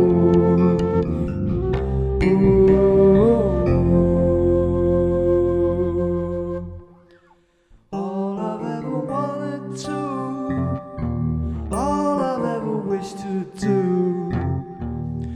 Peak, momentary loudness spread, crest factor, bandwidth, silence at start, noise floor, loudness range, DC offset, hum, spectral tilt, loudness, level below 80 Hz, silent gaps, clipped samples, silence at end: -4 dBFS; 13 LU; 16 dB; 10.5 kHz; 0 s; -57 dBFS; 11 LU; under 0.1%; none; -9 dB/octave; -20 LUFS; -32 dBFS; none; under 0.1%; 0 s